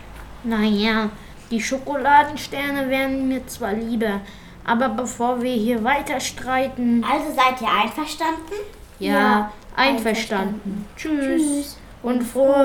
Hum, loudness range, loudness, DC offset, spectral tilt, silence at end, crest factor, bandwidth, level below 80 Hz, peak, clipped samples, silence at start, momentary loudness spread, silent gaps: none; 2 LU; -21 LUFS; under 0.1%; -4 dB/octave; 0 s; 18 dB; 19 kHz; -46 dBFS; -4 dBFS; under 0.1%; 0 s; 12 LU; none